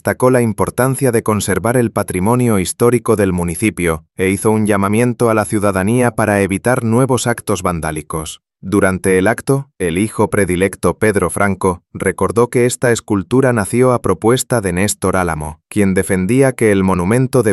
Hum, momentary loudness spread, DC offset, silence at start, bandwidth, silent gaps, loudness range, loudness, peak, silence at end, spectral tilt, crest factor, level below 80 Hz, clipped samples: none; 5 LU; under 0.1%; 0.05 s; 14 kHz; none; 2 LU; -15 LUFS; 0 dBFS; 0 s; -6 dB/octave; 14 dB; -40 dBFS; under 0.1%